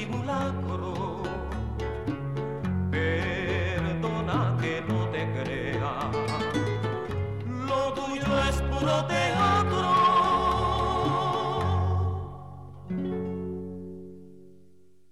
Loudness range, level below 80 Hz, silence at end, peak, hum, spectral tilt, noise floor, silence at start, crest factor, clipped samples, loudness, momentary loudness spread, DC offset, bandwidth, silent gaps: 6 LU; -42 dBFS; 0.6 s; -12 dBFS; none; -6.5 dB/octave; -60 dBFS; 0 s; 14 dB; under 0.1%; -28 LUFS; 10 LU; 0.3%; 12.5 kHz; none